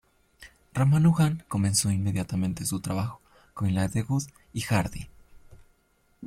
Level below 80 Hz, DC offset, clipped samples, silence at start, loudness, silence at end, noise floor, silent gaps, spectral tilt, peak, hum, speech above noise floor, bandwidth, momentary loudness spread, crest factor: -52 dBFS; under 0.1%; under 0.1%; 0.4 s; -27 LUFS; 0 s; -67 dBFS; none; -5.5 dB/octave; -10 dBFS; none; 41 dB; 15.5 kHz; 14 LU; 18 dB